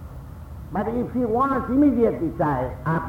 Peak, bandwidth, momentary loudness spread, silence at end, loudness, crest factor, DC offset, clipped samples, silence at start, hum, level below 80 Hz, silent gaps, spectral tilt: -8 dBFS; 16 kHz; 20 LU; 0 s; -22 LUFS; 14 dB; under 0.1%; under 0.1%; 0 s; none; -40 dBFS; none; -9.5 dB/octave